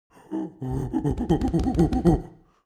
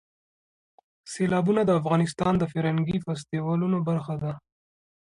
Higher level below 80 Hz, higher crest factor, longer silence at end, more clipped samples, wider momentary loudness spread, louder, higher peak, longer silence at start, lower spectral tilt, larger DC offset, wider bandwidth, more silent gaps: first, -34 dBFS vs -56 dBFS; about the same, 20 dB vs 16 dB; second, 0.35 s vs 0.65 s; neither; first, 12 LU vs 9 LU; about the same, -25 LUFS vs -26 LUFS; first, -6 dBFS vs -10 dBFS; second, 0.3 s vs 1.05 s; about the same, -8.5 dB/octave vs -7.5 dB/octave; neither; about the same, 12 kHz vs 11 kHz; neither